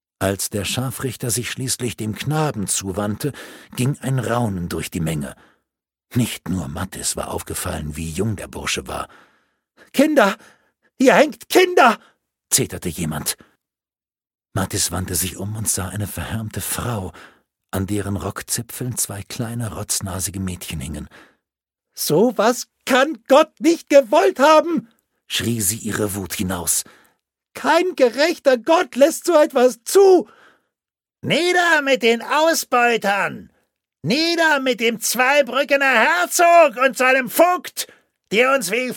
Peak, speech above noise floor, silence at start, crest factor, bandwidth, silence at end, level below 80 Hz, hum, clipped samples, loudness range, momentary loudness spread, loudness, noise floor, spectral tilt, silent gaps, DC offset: 0 dBFS; over 71 dB; 0.2 s; 20 dB; 17.5 kHz; 0 s; -48 dBFS; none; under 0.1%; 9 LU; 13 LU; -18 LUFS; under -90 dBFS; -4 dB/octave; none; under 0.1%